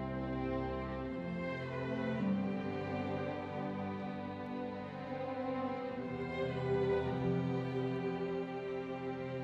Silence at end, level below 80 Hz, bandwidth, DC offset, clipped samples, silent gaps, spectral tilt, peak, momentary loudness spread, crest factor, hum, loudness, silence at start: 0 s; -58 dBFS; 7.8 kHz; under 0.1%; under 0.1%; none; -8.5 dB/octave; -24 dBFS; 7 LU; 14 dB; none; -39 LUFS; 0 s